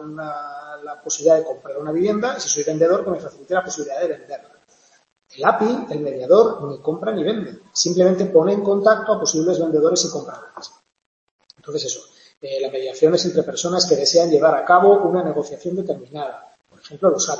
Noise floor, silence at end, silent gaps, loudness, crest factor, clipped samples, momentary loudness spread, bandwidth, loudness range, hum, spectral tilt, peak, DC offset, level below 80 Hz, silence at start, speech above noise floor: -57 dBFS; 0 s; 11.06-11.39 s, 12.37-12.41 s; -19 LUFS; 18 dB; under 0.1%; 16 LU; 8.2 kHz; 7 LU; none; -4 dB/octave; -2 dBFS; under 0.1%; -66 dBFS; 0 s; 38 dB